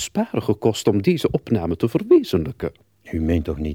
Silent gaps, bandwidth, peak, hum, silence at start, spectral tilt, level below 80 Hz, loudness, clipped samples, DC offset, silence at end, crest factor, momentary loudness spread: none; 16.5 kHz; -4 dBFS; none; 0 s; -6.5 dB/octave; -38 dBFS; -21 LUFS; under 0.1%; under 0.1%; 0 s; 16 dB; 11 LU